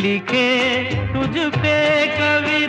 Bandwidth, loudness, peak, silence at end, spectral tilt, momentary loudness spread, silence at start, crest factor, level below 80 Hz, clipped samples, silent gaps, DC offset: 10 kHz; -17 LUFS; -6 dBFS; 0 s; -5.5 dB/octave; 5 LU; 0 s; 12 dB; -42 dBFS; under 0.1%; none; under 0.1%